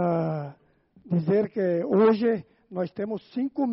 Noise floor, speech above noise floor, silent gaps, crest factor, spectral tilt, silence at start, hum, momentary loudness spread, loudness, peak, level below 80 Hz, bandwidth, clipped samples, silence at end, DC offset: -60 dBFS; 36 dB; none; 18 dB; -8 dB/octave; 0 s; none; 12 LU; -26 LUFS; -8 dBFS; -68 dBFS; 5.8 kHz; under 0.1%; 0 s; under 0.1%